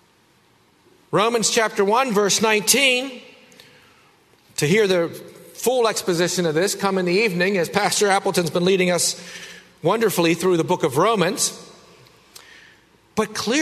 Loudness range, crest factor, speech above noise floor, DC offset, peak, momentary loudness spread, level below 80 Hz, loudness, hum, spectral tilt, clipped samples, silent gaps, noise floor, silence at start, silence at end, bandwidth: 3 LU; 20 dB; 38 dB; under 0.1%; 0 dBFS; 12 LU; -64 dBFS; -19 LUFS; none; -3.5 dB/octave; under 0.1%; none; -58 dBFS; 1.1 s; 0 s; 13.5 kHz